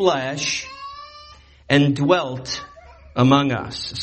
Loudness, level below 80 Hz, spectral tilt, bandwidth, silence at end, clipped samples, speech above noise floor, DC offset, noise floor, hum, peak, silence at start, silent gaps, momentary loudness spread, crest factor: -20 LUFS; -50 dBFS; -5 dB/octave; 8.6 kHz; 0 s; under 0.1%; 27 dB; under 0.1%; -46 dBFS; none; -2 dBFS; 0 s; none; 19 LU; 20 dB